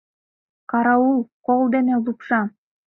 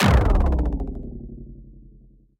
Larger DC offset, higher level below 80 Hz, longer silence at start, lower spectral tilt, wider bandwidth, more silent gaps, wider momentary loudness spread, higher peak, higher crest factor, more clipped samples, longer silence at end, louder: neither; second, -68 dBFS vs -24 dBFS; first, 0.7 s vs 0 s; first, -10 dB/octave vs -6.5 dB/octave; second, 3.9 kHz vs 13 kHz; first, 1.33-1.42 s vs none; second, 6 LU vs 22 LU; about the same, -4 dBFS vs -6 dBFS; about the same, 16 dB vs 16 dB; neither; second, 0.4 s vs 0.6 s; about the same, -20 LUFS vs -22 LUFS